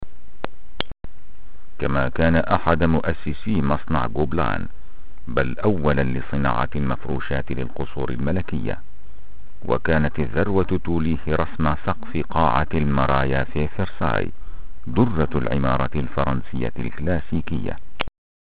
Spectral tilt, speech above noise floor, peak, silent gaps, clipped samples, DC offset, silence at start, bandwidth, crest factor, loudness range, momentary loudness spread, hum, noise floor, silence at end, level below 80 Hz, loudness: -12 dB/octave; 24 dB; -2 dBFS; none; under 0.1%; 9%; 0 s; 4.9 kHz; 22 dB; 4 LU; 12 LU; none; -46 dBFS; 0.35 s; -34 dBFS; -23 LUFS